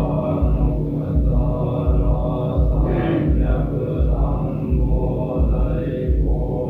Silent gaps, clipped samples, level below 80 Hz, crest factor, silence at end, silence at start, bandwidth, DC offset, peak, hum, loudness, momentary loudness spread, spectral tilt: none; under 0.1%; -20 dBFS; 12 dB; 0 s; 0 s; 3.8 kHz; under 0.1%; -6 dBFS; none; -21 LUFS; 3 LU; -11 dB/octave